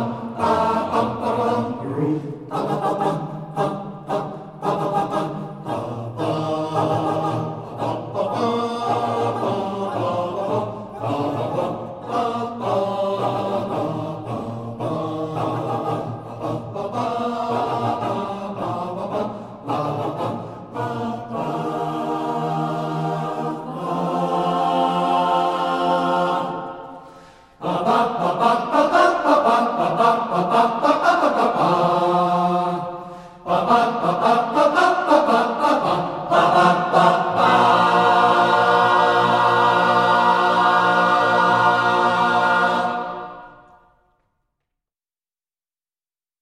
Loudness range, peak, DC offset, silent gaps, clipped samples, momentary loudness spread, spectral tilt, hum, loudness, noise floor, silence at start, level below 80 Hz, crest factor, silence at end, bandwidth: 10 LU; -2 dBFS; under 0.1%; none; under 0.1%; 12 LU; -6 dB/octave; none; -20 LUFS; under -90 dBFS; 0 s; -58 dBFS; 18 dB; 2.9 s; 13.5 kHz